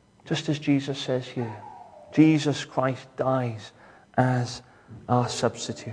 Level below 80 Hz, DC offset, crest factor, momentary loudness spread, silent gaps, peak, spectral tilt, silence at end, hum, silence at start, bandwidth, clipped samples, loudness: -64 dBFS; under 0.1%; 20 dB; 20 LU; none; -6 dBFS; -6 dB/octave; 0 s; none; 0.25 s; 10.5 kHz; under 0.1%; -26 LUFS